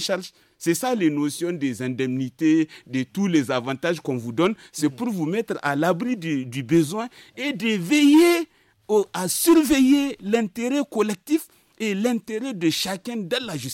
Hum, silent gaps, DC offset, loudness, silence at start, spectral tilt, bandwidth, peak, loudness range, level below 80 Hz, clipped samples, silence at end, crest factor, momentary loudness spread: none; none; under 0.1%; -22 LUFS; 0 s; -4.5 dB/octave; 17 kHz; -8 dBFS; 5 LU; -60 dBFS; under 0.1%; 0 s; 14 dB; 10 LU